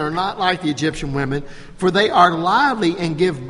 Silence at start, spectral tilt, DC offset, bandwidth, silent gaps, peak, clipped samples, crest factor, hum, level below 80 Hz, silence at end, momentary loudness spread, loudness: 0 s; -5.5 dB/octave; under 0.1%; 11.5 kHz; none; 0 dBFS; under 0.1%; 18 dB; none; -42 dBFS; 0 s; 9 LU; -18 LUFS